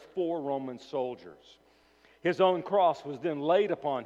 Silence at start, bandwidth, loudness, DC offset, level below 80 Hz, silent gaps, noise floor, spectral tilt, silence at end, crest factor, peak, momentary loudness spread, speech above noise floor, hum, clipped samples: 0 s; 8 kHz; -29 LUFS; under 0.1%; -76 dBFS; none; -62 dBFS; -6.5 dB/octave; 0 s; 18 dB; -12 dBFS; 10 LU; 33 dB; none; under 0.1%